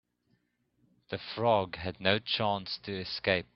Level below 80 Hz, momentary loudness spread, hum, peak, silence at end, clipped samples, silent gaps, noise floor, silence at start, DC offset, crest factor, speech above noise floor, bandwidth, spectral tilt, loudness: -64 dBFS; 10 LU; none; -8 dBFS; 0.1 s; under 0.1%; none; -75 dBFS; 1.1 s; under 0.1%; 24 dB; 43 dB; 6 kHz; -7.5 dB/octave; -31 LUFS